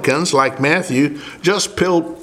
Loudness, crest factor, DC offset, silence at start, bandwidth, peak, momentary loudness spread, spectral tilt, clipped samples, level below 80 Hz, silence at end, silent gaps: -16 LUFS; 16 dB; under 0.1%; 0 s; 15.5 kHz; 0 dBFS; 4 LU; -4 dB/octave; under 0.1%; -50 dBFS; 0 s; none